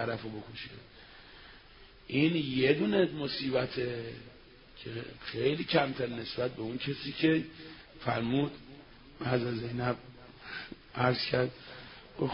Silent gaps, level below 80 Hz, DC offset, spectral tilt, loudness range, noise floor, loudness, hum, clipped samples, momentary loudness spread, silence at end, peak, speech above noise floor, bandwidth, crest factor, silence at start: none; -60 dBFS; under 0.1%; -10 dB/octave; 3 LU; -55 dBFS; -32 LUFS; none; under 0.1%; 23 LU; 0 s; -12 dBFS; 23 dB; 5.6 kHz; 22 dB; 0 s